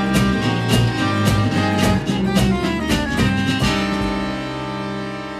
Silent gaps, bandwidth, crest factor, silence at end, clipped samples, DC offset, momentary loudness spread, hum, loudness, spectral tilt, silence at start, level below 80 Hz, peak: none; 14 kHz; 16 dB; 0 s; under 0.1%; under 0.1%; 8 LU; 50 Hz at -40 dBFS; -19 LUFS; -5.5 dB/octave; 0 s; -32 dBFS; -2 dBFS